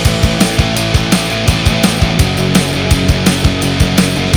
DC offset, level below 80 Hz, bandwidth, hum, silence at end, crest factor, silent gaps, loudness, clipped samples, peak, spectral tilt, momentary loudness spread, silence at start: under 0.1%; -20 dBFS; over 20 kHz; none; 0 s; 12 dB; none; -12 LUFS; 0.2%; 0 dBFS; -4.5 dB/octave; 2 LU; 0 s